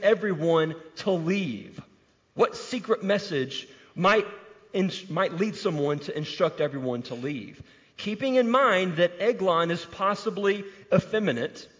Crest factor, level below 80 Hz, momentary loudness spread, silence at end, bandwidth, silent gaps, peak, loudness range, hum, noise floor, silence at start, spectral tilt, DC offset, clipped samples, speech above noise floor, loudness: 18 dB; -66 dBFS; 11 LU; 0.15 s; 7.6 kHz; none; -10 dBFS; 4 LU; none; -62 dBFS; 0 s; -6 dB/octave; under 0.1%; under 0.1%; 36 dB; -26 LUFS